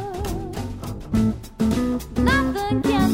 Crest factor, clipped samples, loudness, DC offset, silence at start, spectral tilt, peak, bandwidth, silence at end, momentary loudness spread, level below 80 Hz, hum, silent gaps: 18 dB; under 0.1%; -23 LUFS; under 0.1%; 0 s; -6 dB/octave; -4 dBFS; 16.5 kHz; 0 s; 11 LU; -32 dBFS; none; none